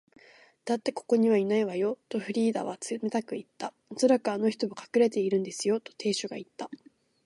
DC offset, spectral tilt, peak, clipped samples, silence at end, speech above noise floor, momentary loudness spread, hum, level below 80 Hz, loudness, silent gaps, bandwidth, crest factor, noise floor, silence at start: under 0.1%; -5 dB/octave; -10 dBFS; under 0.1%; 0.5 s; 29 dB; 15 LU; none; -80 dBFS; -29 LUFS; none; 11.5 kHz; 18 dB; -58 dBFS; 0.65 s